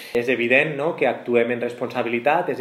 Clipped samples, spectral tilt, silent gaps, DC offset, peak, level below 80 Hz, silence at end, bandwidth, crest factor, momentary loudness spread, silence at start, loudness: under 0.1%; -6 dB/octave; none; under 0.1%; -4 dBFS; -66 dBFS; 0 s; 14.5 kHz; 18 dB; 8 LU; 0 s; -21 LUFS